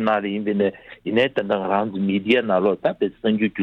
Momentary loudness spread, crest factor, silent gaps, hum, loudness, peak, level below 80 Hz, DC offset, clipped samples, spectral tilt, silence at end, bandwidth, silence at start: 5 LU; 16 dB; none; none; -21 LUFS; -6 dBFS; -60 dBFS; under 0.1%; under 0.1%; -8 dB/octave; 0 s; 6 kHz; 0 s